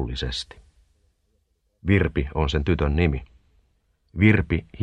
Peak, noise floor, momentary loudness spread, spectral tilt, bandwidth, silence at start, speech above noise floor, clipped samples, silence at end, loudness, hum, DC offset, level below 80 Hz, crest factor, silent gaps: -2 dBFS; -69 dBFS; 14 LU; -7 dB/octave; 9.8 kHz; 0 s; 47 dB; under 0.1%; 0 s; -23 LUFS; none; under 0.1%; -34 dBFS; 22 dB; none